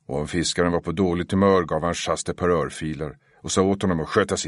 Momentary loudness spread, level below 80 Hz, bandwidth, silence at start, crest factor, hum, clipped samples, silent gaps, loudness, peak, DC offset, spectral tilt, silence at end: 11 LU; -46 dBFS; 11.5 kHz; 0.1 s; 18 dB; none; under 0.1%; none; -23 LUFS; -4 dBFS; under 0.1%; -5 dB/octave; 0 s